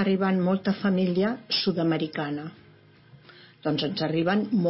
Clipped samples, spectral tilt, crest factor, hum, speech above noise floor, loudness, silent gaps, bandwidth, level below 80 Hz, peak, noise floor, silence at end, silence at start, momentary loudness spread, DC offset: under 0.1%; -9.5 dB/octave; 14 dB; none; 29 dB; -26 LUFS; none; 5.8 kHz; -70 dBFS; -12 dBFS; -54 dBFS; 0 s; 0 s; 8 LU; under 0.1%